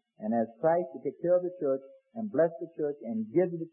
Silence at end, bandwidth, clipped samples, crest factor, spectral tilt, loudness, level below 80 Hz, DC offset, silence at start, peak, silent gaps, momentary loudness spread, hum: 0.05 s; 2.9 kHz; under 0.1%; 16 dB; -13 dB/octave; -31 LUFS; -82 dBFS; under 0.1%; 0.2 s; -14 dBFS; none; 8 LU; none